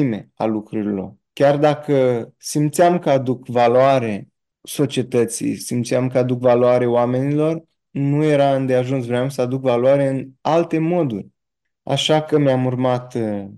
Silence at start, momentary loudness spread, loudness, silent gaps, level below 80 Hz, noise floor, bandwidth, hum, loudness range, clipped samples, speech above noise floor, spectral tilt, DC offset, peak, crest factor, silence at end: 0 s; 9 LU; -18 LUFS; none; -64 dBFS; -81 dBFS; 12.5 kHz; none; 2 LU; under 0.1%; 63 dB; -6 dB/octave; under 0.1%; -4 dBFS; 14 dB; 0 s